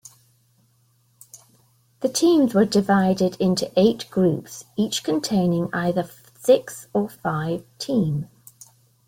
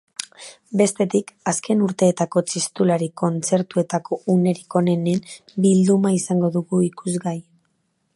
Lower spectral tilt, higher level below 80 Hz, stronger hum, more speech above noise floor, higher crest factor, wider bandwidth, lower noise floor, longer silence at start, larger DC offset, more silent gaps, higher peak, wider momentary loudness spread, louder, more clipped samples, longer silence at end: about the same, -5.5 dB/octave vs -6 dB/octave; first, -60 dBFS vs -66 dBFS; neither; second, 41 dB vs 49 dB; about the same, 18 dB vs 18 dB; first, 17 kHz vs 11.5 kHz; second, -62 dBFS vs -69 dBFS; first, 1.35 s vs 0.2 s; neither; neither; about the same, -4 dBFS vs -4 dBFS; about the same, 10 LU vs 9 LU; about the same, -22 LUFS vs -20 LUFS; neither; about the same, 0.85 s vs 0.75 s